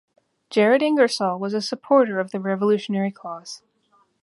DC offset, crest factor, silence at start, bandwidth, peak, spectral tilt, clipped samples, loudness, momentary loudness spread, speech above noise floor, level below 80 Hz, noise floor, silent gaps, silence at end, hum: under 0.1%; 18 dB; 0.5 s; 11.5 kHz; -4 dBFS; -5.5 dB/octave; under 0.1%; -21 LUFS; 17 LU; 42 dB; -74 dBFS; -63 dBFS; none; 0.65 s; none